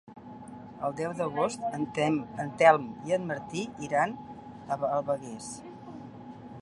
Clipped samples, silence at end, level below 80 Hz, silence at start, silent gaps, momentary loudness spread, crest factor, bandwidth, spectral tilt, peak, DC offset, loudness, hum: under 0.1%; 0 s; -66 dBFS; 0.05 s; none; 22 LU; 24 dB; 11.5 kHz; -5.5 dB/octave; -6 dBFS; under 0.1%; -29 LUFS; none